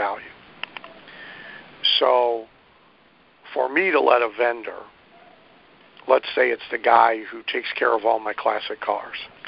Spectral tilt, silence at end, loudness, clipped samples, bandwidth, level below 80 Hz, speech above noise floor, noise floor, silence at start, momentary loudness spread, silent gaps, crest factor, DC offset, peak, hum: -6.5 dB/octave; 0.2 s; -21 LUFS; under 0.1%; 5.6 kHz; -68 dBFS; 35 dB; -56 dBFS; 0 s; 22 LU; none; 22 dB; under 0.1%; -2 dBFS; none